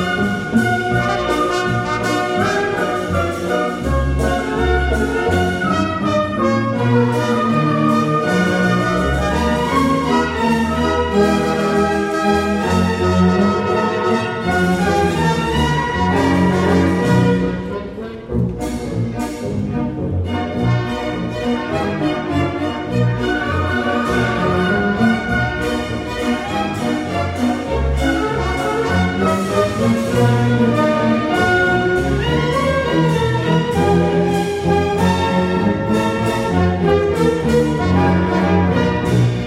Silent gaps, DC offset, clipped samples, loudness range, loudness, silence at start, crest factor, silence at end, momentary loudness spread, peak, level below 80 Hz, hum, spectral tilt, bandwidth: none; under 0.1%; under 0.1%; 4 LU; -17 LUFS; 0 s; 14 dB; 0 s; 6 LU; -2 dBFS; -30 dBFS; none; -6.5 dB/octave; 15.5 kHz